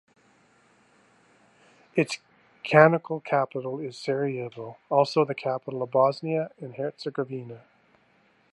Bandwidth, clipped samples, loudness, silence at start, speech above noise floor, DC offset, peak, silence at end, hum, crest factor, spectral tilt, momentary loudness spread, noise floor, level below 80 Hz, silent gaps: 11.5 kHz; under 0.1%; -26 LUFS; 1.95 s; 38 dB; under 0.1%; -2 dBFS; 0.95 s; 60 Hz at -70 dBFS; 26 dB; -6.5 dB/octave; 17 LU; -64 dBFS; -78 dBFS; none